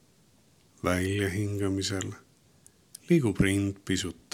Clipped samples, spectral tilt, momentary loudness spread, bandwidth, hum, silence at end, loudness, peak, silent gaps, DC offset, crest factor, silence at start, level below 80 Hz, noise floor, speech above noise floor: under 0.1%; -5.5 dB/octave; 13 LU; 16.5 kHz; none; 0.2 s; -29 LUFS; -10 dBFS; none; under 0.1%; 20 dB; 0.85 s; -52 dBFS; -63 dBFS; 35 dB